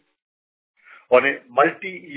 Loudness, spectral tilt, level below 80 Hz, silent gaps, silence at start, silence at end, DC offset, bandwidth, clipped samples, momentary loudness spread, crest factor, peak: -19 LUFS; -8 dB/octave; -70 dBFS; none; 1.1 s; 0 s; under 0.1%; 4 kHz; under 0.1%; 5 LU; 22 dB; -2 dBFS